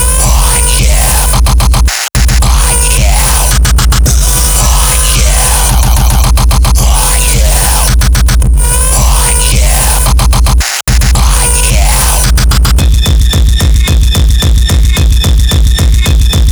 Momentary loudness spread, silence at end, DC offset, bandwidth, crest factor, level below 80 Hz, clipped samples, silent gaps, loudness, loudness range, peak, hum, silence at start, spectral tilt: 1 LU; 0 s; under 0.1%; over 20 kHz; 6 dB; -8 dBFS; under 0.1%; none; -8 LUFS; 1 LU; 0 dBFS; none; 0 s; -3 dB/octave